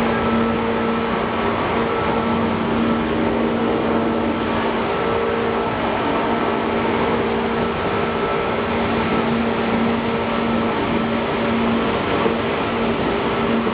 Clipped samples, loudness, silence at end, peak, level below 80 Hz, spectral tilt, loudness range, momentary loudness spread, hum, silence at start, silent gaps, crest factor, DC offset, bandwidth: under 0.1%; -20 LUFS; 0 s; -6 dBFS; -40 dBFS; -9.5 dB/octave; 0 LU; 2 LU; none; 0 s; none; 14 dB; under 0.1%; 5 kHz